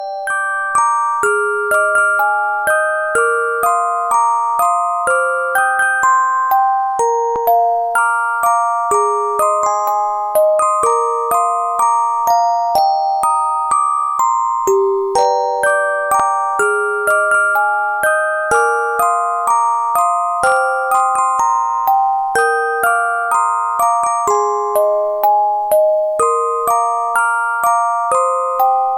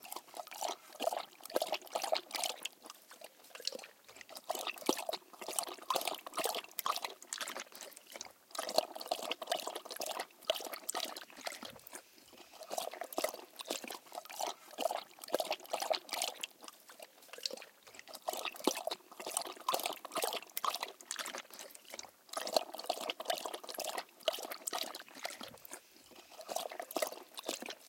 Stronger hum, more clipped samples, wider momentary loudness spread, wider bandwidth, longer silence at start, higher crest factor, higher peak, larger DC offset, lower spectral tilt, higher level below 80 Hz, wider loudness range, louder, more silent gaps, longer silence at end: neither; neither; second, 2 LU vs 14 LU; about the same, 17 kHz vs 17 kHz; about the same, 0 s vs 0 s; second, 10 dB vs 30 dB; first, -4 dBFS vs -12 dBFS; neither; first, -1.5 dB/octave vs 0 dB/octave; first, -56 dBFS vs -88 dBFS; second, 1 LU vs 4 LU; first, -14 LUFS vs -40 LUFS; neither; about the same, 0 s vs 0 s